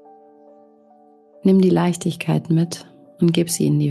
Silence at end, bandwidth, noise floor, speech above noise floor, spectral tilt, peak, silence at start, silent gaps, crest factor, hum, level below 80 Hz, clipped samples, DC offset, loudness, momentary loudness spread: 0 s; 12.5 kHz; -51 dBFS; 34 dB; -6.5 dB/octave; -6 dBFS; 1.45 s; none; 14 dB; none; -62 dBFS; under 0.1%; under 0.1%; -19 LUFS; 8 LU